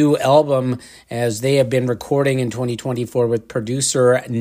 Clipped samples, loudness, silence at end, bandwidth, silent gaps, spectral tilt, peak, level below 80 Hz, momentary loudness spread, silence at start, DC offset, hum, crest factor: under 0.1%; -18 LUFS; 0 s; 16 kHz; none; -5.5 dB/octave; -2 dBFS; -56 dBFS; 9 LU; 0 s; under 0.1%; none; 16 dB